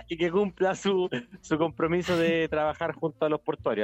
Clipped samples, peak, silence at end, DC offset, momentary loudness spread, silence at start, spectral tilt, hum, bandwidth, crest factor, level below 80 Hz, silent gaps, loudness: under 0.1%; -12 dBFS; 0 s; under 0.1%; 6 LU; 0 s; -6 dB/octave; none; 14 kHz; 14 dB; -56 dBFS; none; -27 LUFS